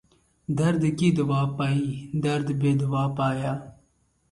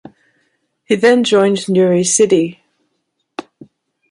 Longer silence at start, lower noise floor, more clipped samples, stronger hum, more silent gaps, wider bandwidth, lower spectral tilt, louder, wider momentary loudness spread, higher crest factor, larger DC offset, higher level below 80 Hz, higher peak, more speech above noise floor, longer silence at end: second, 0.5 s vs 0.9 s; about the same, -67 dBFS vs -70 dBFS; neither; neither; neither; about the same, 11.5 kHz vs 11.5 kHz; first, -7.5 dB/octave vs -4 dB/octave; second, -25 LUFS vs -13 LUFS; second, 8 LU vs 20 LU; about the same, 16 dB vs 14 dB; neither; first, -56 dBFS vs -62 dBFS; second, -10 dBFS vs -2 dBFS; second, 43 dB vs 58 dB; about the same, 0.6 s vs 0.7 s